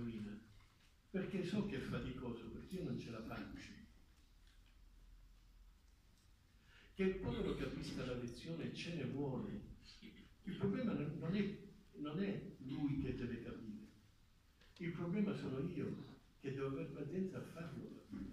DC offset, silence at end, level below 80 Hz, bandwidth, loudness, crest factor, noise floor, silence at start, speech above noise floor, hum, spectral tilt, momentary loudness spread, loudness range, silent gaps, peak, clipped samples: under 0.1%; 0 s; -62 dBFS; 14.5 kHz; -45 LUFS; 18 dB; -70 dBFS; 0 s; 26 dB; none; -7.5 dB/octave; 14 LU; 7 LU; none; -26 dBFS; under 0.1%